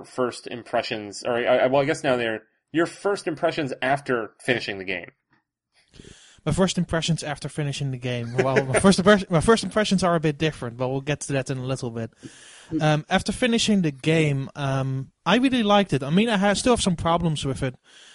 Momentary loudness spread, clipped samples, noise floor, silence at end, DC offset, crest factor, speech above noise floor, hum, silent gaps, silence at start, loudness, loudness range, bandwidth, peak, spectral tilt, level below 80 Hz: 10 LU; under 0.1%; -69 dBFS; 0.4 s; under 0.1%; 20 dB; 46 dB; none; none; 0 s; -23 LUFS; 6 LU; 11.5 kHz; -4 dBFS; -5 dB/octave; -48 dBFS